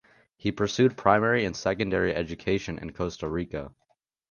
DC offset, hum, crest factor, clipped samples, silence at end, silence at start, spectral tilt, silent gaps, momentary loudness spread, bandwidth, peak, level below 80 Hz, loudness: under 0.1%; none; 22 dB; under 0.1%; 0.6 s; 0.45 s; -5.5 dB/octave; none; 12 LU; 7.2 kHz; -4 dBFS; -50 dBFS; -27 LUFS